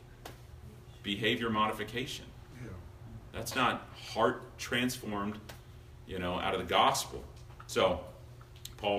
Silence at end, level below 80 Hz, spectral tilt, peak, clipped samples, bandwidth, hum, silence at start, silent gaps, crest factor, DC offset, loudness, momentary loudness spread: 0 s; -56 dBFS; -4 dB/octave; -12 dBFS; under 0.1%; 15.5 kHz; none; 0 s; none; 22 dB; under 0.1%; -33 LUFS; 21 LU